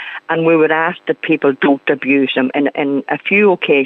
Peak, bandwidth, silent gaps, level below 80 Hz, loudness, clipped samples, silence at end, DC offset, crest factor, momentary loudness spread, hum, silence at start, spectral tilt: -2 dBFS; 4.1 kHz; none; -72 dBFS; -14 LUFS; under 0.1%; 0 s; under 0.1%; 12 dB; 6 LU; none; 0 s; -8.5 dB/octave